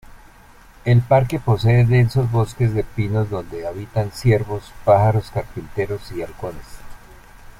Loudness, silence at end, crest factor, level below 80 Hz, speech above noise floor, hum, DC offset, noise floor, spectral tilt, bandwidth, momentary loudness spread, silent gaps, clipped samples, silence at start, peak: -19 LUFS; 0.65 s; 18 dB; -40 dBFS; 28 dB; none; under 0.1%; -46 dBFS; -8 dB/octave; 13 kHz; 14 LU; none; under 0.1%; 0.1 s; -2 dBFS